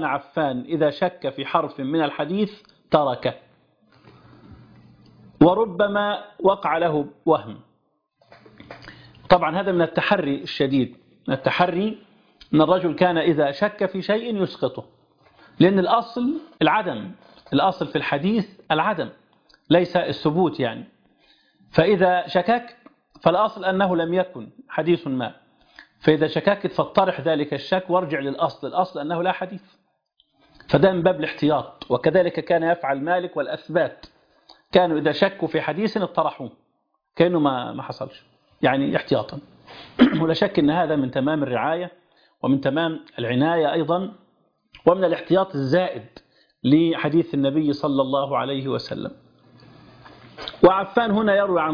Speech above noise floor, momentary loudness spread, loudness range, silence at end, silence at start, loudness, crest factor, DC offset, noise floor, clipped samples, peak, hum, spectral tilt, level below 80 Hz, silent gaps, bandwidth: 50 dB; 11 LU; 3 LU; 0 s; 0 s; -22 LUFS; 20 dB; under 0.1%; -71 dBFS; under 0.1%; -2 dBFS; none; -8 dB/octave; -56 dBFS; none; 5.2 kHz